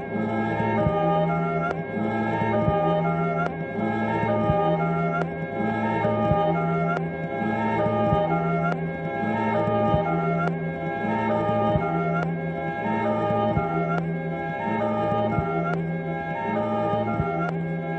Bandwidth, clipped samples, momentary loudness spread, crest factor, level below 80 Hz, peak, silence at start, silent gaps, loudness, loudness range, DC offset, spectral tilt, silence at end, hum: 6.2 kHz; under 0.1%; 6 LU; 16 dB; -46 dBFS; -8 dBFS; 0 s; none; -25 LUFS; 2 LU; under 0.1%; -9 dB/octave; 0 s; none